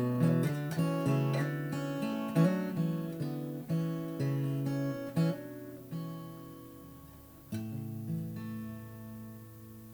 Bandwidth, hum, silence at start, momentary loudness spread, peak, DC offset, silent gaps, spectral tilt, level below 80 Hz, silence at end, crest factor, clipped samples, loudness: over 20 kHz; none; 0 s; 20 LU; -16 dBFS; under 0.1%; none; -8 dB/octave; -68 dBFS; 0 s; 20 dB; under 0.1%; -34 LUFS